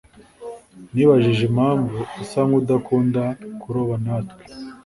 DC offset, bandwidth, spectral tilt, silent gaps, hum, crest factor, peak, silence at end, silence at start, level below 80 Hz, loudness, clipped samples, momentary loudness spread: under 0.1%; 11.5 kHz; -8 dB/octave; none; none; 18 dB; -2 dBFS; 0.1 s; 0.4 s; -54 dBFS; -20 LUFS; under 0.1%; 21 LU